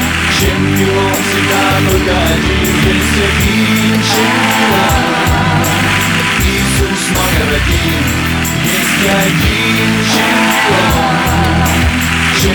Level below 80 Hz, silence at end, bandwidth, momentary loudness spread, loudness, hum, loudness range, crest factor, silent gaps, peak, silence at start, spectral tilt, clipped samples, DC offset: -22 dBFS; 0 s; 19.5 kHz; 2 LU; -11 LUFS; none; 1 LU; 10 dB; none; -2 dBFS; 0 s; -4 dB/octave; under 0.1%; under 0.1%